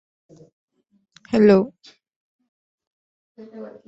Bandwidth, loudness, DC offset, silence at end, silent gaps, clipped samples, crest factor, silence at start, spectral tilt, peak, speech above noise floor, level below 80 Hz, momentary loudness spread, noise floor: 8 kHz; -18 LUFS; under 0.1%; 0.2 s; 2.16-2.39 s, 2.48-2.78 s, 2.87-3.35 s; under 0.1%; 22 dB; 1.3 s; -8 dB/octave; -4 dBFS; 39 dB; -60 dBFS; 24 LU; -58 dBFS